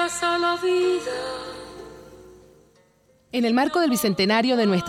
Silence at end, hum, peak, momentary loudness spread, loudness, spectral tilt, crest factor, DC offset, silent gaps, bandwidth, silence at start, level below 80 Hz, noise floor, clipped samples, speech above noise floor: 0 s; none; -8 dBFS; 18 LU; -22 LUFS; -4.5 dB/octave; 16 dB; under 0.1%; none; 16.5 kHz; 0 s; -58 dBFS; -60 dBFS; under 0.1%; 38 dB